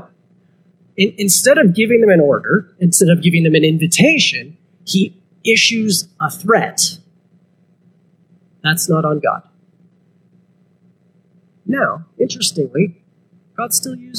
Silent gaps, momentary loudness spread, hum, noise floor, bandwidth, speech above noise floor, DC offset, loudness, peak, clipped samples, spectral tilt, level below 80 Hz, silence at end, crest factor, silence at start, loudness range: none; 11 LU; 60 Hz at -40 dBFS; -54 dBFS; 16 kHz; 40 dB; under 0.1%; -14 LUFS; 0 dBFS; under 0.1%; -4 dB/octave; -66 dBFS; 0 s; 16 dB; 1 s; 10 LU